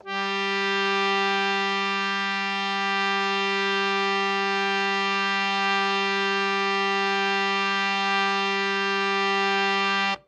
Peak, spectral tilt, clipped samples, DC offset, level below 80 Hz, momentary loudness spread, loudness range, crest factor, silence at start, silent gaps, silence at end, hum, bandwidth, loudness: -10 dBFS; -3 dB/octave; under 0.1%; under 0.1%; -80 dBFS; 2 LU; 1 LU; 14 dB; 0.05 s; none; 0.1 s; none; 9.2 kHz; -23 LUFS